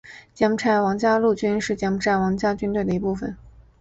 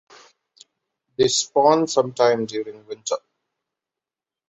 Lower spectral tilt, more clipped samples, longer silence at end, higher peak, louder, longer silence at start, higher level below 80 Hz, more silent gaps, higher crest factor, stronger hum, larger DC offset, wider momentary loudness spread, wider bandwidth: first, -6 dB/octave vs -3.5 dB/octave; neither; second, 0.2 s vs 1.3 s; second, -6 dBFS vs -2 dBFS; about the same, -22 LUFS vs -20 LUFS; second, 0.05 s vs 1.2 s; first, -48 dBFS vs -64 dBFS; neither; about the same, 16 dB vs 20 dB; neither; neither; second, 5 LU vs 15 LU; about the same, 8.2 kHz vs 8.2 kHz